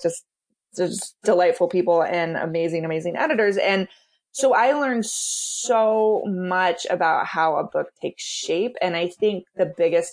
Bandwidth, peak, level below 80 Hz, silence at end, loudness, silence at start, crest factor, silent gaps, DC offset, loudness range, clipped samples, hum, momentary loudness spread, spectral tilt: 10.5 kHz; -6 dBFS; -74 dBFS; 0 s; -22 LUFS; 0 s; 16 dB; none; under 0.1%; 2 LU; under 0.1%; none; 9 LU; -3.5 dB/octave